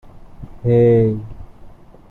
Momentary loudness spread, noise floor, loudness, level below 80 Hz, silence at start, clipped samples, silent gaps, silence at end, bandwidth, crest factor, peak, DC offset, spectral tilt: 17 LU; -40 dBFS; -16 LUFS; -40 dBFS; 0.15 s; under 0.1%; none; 0.4 s; 4.1 kHz; 16 dB; -4 dBFS; under 0.1%; -11.5 dB/octave